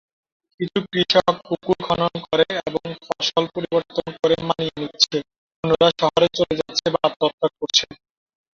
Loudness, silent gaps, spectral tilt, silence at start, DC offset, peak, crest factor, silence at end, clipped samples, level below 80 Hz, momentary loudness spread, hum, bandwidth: -21 LUFS; 5.38-5.50 s, 5.56-5.63 s, 7.16-7.20 s, 7.33-7.38 s; -4 dB/octave; 0.6 s; under 0.1%; -2 dBFS; 20 dB; 0.6 s; under 0.1%; -54 dBFS; 10 LU; none; 7.6 kHz